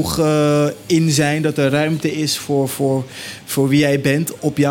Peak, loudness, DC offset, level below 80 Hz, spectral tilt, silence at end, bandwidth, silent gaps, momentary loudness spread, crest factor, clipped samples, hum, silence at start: -4 dBFS; -17 LUFS; under 0.1%; -48 dBFS; -5.5 dB/octave; 0 s; 17 kHz; none; 6 LU; 14 dB; under 0.1%; none; 0 s